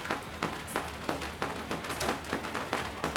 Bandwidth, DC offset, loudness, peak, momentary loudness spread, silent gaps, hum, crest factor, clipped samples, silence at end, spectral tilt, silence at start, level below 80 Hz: over 20 kHz; under 0.1%; -35 LUFS; -6 dBFS; 3 LU; none; none; 28 dB; under 0.1%; 0 s; -3.5 dB/octave; 0 s; -52 dBFS